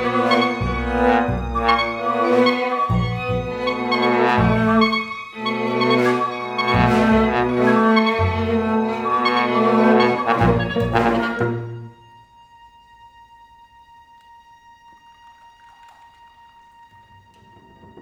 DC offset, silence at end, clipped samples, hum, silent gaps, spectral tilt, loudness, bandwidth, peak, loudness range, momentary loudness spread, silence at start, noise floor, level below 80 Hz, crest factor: under 0.1%; 0 s; under 0.1%; none; none; -7 dB/octave; -18 LUFS; 10.5 kHz; -2 dBFS; 5 LU; 8 LU; 0 s; -49 dBFS; -38 dBFS; 18 dB